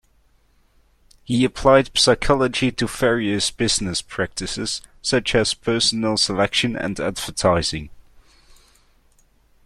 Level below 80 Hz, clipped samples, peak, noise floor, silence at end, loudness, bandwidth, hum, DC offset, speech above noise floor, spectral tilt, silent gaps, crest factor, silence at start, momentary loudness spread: -42 dBFS; under 0.1%; -2 dBFS; -59 dBFS; 1.65 s; -20 LUFS; 14 kHz; none; under 0.1%; 39 dB; -3.5 dB/octave; none; 20 dB; 1.3 s; 10 LU